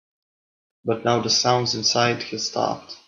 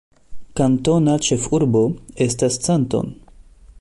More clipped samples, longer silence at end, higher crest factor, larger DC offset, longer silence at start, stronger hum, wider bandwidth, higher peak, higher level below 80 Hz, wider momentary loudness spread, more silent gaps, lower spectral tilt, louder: neither; second, 0.1 s vs 0.7 s; first, 20 dB vs 14 dB; neither; first, 0.85 s vs 0.3 s; neither; second, 7.6 kHz vs 11.5 kHz; about the same, -4 dBFS vs -6 dBFS; second, -64 dBFS vs -44 dBFS; about the same, 8 LU vs 6 LU; neither; second, -3 dB/octave vs -5.5 dB/octave; second, -21 LUFS vs -18 LUFS